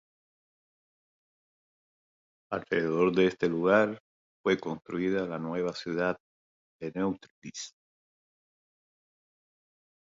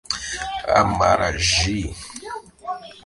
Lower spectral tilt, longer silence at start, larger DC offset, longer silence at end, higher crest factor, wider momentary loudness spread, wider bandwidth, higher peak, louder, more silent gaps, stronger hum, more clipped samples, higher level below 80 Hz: first, -6 dB/octave vs -3 dB/octave; first, 2.5 s vs 0.1 s; neither; first, 2.4 s vs 0.05 s; about the same, 22 dB vs 22 dB; about the same, 16 LU vs 16 LU; second, 7.8 kHz vs 11.5 kHz; second, -10 dBFS vs 0 dBFS; second, -29 LUFS vs -20 LUFS; first, 4.00-4.44 s, 6.20-6.79 s, 7.30-7.42 s vs none; neither; neither; second, -68 dBFS vs -36 dBFS